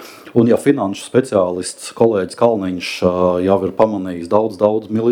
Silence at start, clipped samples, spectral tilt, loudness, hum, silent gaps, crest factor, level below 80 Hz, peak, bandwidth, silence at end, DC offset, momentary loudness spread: 0 s; under 0.1%; -6 dB/octave; -16 LUFS; none; none; 16 dB; -54 dBFS; 0 dBFS; 16.5 kHz; 0 s; under 0.1%; 6 LU